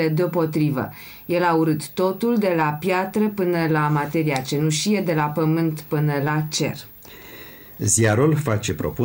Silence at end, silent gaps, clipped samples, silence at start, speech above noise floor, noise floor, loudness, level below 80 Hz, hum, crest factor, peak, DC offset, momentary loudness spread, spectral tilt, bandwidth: 0 s; none; under 0.1%; 0 s; 20 dB; -41 dBFS; -21 LUFS; -52 dBFS; none; 14 dB; -6 dBFS; under 0.1%; 14 LU; -5.5 dB/octave; 17 kHz